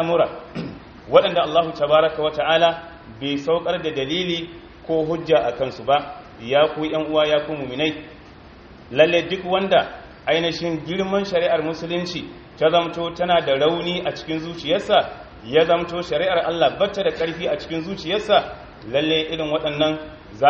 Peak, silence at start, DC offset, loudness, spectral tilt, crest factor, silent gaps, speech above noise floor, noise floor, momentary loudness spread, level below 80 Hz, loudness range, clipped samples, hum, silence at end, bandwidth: 0 dBFS; 0 s; under 0.1%; -21 LUFS; -2.5 dB/octave; 20 dB; none; 23 dB; -43 dBFS; 14 LU; -50 dBFS; 2 LU; under 0.1%; none; 0 s; 7.2 kHz